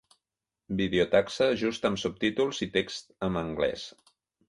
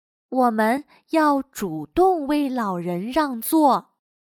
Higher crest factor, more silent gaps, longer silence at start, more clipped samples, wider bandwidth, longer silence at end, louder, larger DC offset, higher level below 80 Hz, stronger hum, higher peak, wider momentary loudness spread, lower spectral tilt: about the same, 20 dB vs 16 dB; neither; first, 0.7 s vs 0.3 s; neither; second, 11.5 kHz vs 19 kHz; first, 0.6 s vs 0.45 s; second, -28 LUFS vs -22 LUFS; neither; about the same, -56 dBFS vs -54 dBFS; neither; second, -10 dBFS vs -6 dBFS; about the same, 10 LU vs 8 LU; about the same, -5 dB/octave vs -5.5 dB/octave